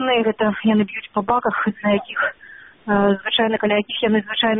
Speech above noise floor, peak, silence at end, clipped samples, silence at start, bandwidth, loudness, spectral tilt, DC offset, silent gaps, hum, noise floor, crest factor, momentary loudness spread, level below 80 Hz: 25 dB; -4 dBFS; 0 s; under 0.1%; 0 s; 3.9 kHz; -19 LUFS; -3 dB/octave; under 0.1%; none; none; -44 dBFS; 16 dB; 5 LU; -54 dBFS